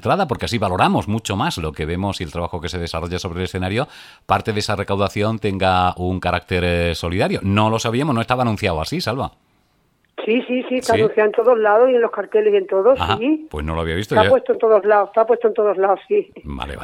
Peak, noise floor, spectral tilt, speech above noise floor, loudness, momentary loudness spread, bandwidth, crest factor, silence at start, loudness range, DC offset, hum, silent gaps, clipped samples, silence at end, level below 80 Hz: -2 dBFS; -62 dBFS; -6 dB/octave; 44 dB; -18 LUFS; 10 LU; 15.5 kHz; 18 dB; 0 s; 6 LU; under 0.1%; none; none; under 0.1%; 0 s; -40 dBFS